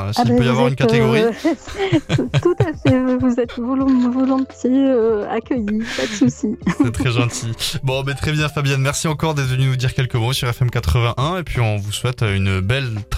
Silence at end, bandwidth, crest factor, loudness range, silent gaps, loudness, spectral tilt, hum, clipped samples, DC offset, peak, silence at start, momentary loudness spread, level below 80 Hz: 0 s; 15 kHz; 16 dB; 2 LU; none; -18 LUFS; -6 dB/octave; none; under 0.1%; under 0.1%; -2 dBFS; 0 s; 6 LU; -36 dBFS